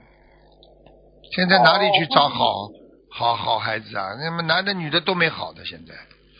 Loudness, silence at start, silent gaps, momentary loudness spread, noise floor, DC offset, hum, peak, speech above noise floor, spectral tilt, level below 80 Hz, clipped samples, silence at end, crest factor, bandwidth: -20 LUFS; 1.3 s; none; 18 LU; -53 dBFS; under 0.1%; none; 0 dBFS; 32 dB; -7 dB/octave; -58 dBFS; under 0.1%; 0.35 s; 22 dB; 5.4 kHz